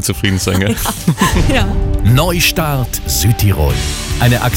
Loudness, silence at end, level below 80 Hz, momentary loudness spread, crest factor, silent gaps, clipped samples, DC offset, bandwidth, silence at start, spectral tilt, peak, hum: -14 LUFS; 0 s; -20 dBFS; 5 LU; 12 dB; none; under 0.1%; under 0.1%; 17 kHz; 0 s; -4.5 dB/octave; 0 dBFS; none